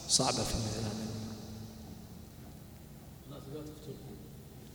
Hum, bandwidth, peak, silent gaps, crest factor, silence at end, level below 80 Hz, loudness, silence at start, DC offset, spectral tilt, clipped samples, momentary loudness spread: none; over 20 kHz; -14 dBFS; none; 26 dB; 0 s; -54 dBFS; -36 LUFS; 0 s; under 0.1%; -3.5 dB/octave; under 0.1%; 19 LU